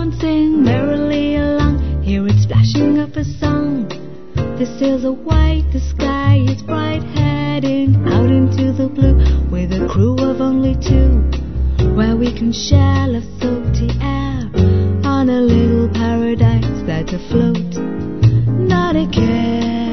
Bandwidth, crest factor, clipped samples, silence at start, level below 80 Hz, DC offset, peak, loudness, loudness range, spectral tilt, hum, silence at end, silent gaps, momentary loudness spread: 6.4 kHz; 14 dB; under 0.1%; 0 s; -22 dBFS; 3%; 0 dBFS; -15 LUFS; 2 LU; -7.5 dB/octave; none; 0 s; none; 7 LU